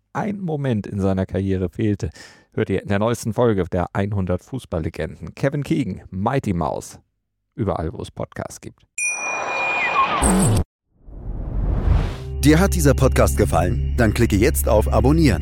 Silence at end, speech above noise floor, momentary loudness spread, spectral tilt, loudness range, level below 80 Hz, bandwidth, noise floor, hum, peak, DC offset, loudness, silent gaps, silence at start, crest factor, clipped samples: 0 s; 55 dB; 14 LU; -6 dB/octave; 8 LU; -28 dBFS; 17 kHz; -74 dBFS; none; -2 dBFS; under 0.1%; -20 LUFS; 10.65-10.79 s; 0.15 s; 18 dB; under 0.1%